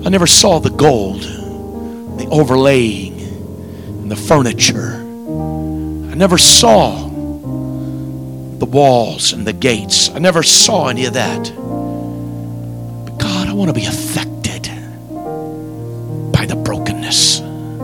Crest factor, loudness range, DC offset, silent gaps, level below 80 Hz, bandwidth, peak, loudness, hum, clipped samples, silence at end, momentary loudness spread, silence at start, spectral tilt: 14 dB; 9 LU; 0.3%; none; -36 dBFS; over 20 kHz; 0 dBFS; -12 LUFS; none; 0.5%; 0 s; 19 LU; 0 s; -3.5 dB/octave